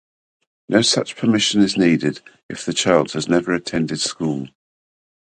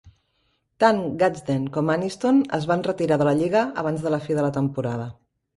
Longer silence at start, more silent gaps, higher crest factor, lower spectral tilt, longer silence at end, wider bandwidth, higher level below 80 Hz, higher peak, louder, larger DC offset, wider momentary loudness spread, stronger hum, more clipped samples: first, 0.7 s vs 0.05 s; first, 2.43-2.49 s vs none; about the same, 20 dB vs 20 dB; second, -4 dB/octave vs -7 dB/octave; first, 0.75 s vs 0.45 s; second, 9.6 kHz vs 11.5 kHz; about the same, -56 dBFS vs -58 dBFS; about the same, 0 dBFS vs -2 dBFS; first, -19 LUFS vs -23 LUFS; neither; first, 13 LU vs 6 LU; neither; neither